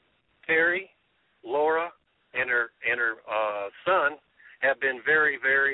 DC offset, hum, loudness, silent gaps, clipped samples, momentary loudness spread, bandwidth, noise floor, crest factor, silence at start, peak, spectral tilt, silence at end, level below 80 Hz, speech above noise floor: under 0.1%; none; -25 LUFS; none; under 0.1%; 9 LU; 4.1 kHz; -69 dBFS; 16 dB; 0.5 s; -12 dBFS; -7.5 dB/octave; 0 s; -70 dBFS; 44 dB